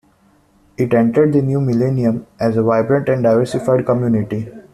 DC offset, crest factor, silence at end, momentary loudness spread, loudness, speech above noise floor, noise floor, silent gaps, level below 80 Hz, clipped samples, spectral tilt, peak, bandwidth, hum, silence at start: under 0.1%; 14 dB; 0.1 s; 6 LU; -16 LUFS; 39 dB; -54 dBFS; none; -52 dBFS; under 0.1%; -9 dB/octave; -2 dBFS; 12.5 kHz; none; 0.8 s